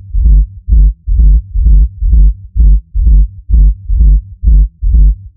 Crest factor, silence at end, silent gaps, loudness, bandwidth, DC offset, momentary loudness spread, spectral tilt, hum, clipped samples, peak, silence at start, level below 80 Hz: 8 dB; 0.1 s; none; -12 LUFS; 0.5 kHz; under 0.1%; 2 LU; -18.5 dB/octave; none; 0.1%; 0 dBFS; 0.1 s; -8 dBFS